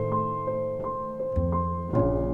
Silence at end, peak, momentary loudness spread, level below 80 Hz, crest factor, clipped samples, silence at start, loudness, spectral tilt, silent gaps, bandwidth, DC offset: 0 s; -12 dBFS; 6 LU; -38 dBFS; 16 dB; under 0.1%; 0 s; -28 LUFS; -11.5 dB/octave; none; 3.4 kHz; under 0.1%